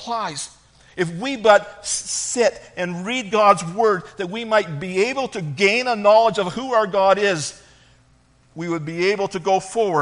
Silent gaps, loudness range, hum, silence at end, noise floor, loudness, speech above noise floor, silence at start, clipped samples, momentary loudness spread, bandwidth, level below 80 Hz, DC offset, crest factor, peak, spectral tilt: none; 3 LU; none; 0 s; -56 dBFS; -20 LUFS; 36 dB; 0 s; under 0.1%; 12 LU; 10.5 kHz; -58 dBFS; under 0.1%; 20 dB; 0 dBFS; -3.5 dB/octave